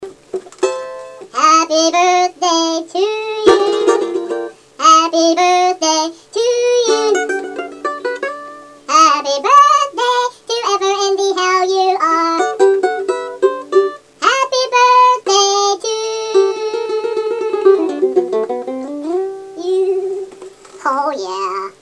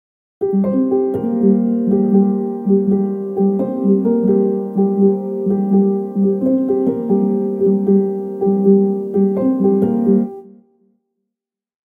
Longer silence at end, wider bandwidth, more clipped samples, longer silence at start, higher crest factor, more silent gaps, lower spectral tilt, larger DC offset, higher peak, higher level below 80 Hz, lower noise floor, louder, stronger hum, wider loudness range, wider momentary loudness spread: second, 0.1 s vs 1.4 s; first, 11 kHz vs 2.2 kHz; neither; second, 0 s vs 0.4 s; about the same, 14 dB vs 14 dB; neither; second, -1 dB/octave vs -13 dB/octave; neither; about the same, 0 dBFS vs -2 dBFS; about the same, -62 dBFS vs -60 dBFS; second, -36 dBFS vs -83 dBFS; about the same, -14 LUFS vs -16 LUFS; neither; first, 4 LU vs 1 LU; first, 13 LU vs 4 LU